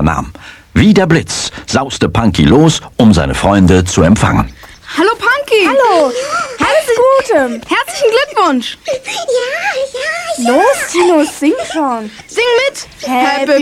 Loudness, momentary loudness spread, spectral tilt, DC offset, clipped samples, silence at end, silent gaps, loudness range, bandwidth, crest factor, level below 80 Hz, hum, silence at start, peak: -11 LUFS; 9 LU; -5 dB/octave; under 0.1%; 0.3%; 0 s; none; 3 LU; 15.5 kHz; 12 dB; -30 dBFS; none; 0 s; 0 dBFS